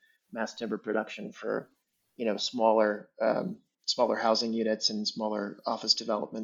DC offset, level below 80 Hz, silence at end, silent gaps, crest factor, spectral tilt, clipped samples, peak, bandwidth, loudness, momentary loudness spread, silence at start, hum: under 0.1%; -84 dBFS; 0 s; none; 22 dB; -3.5 dB/octave; under 0.1%; -10 dBFS; 7.8 kHz; -30 LUFS; 11 LU; 0.3 s; none